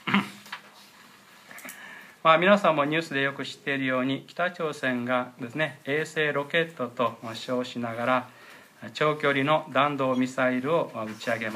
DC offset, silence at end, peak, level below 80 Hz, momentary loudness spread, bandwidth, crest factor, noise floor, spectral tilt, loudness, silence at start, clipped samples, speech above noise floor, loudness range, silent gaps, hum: under 0.1%; 0 s; -6 dBFS; -80 dBFS; 19 LU; 15.5 kHz; 22 dB; -52 dBFS; -5.5 dB/octave; -26 LUFS; 0.05 s; under 0.1%; 26 dB; 4 LU; none; none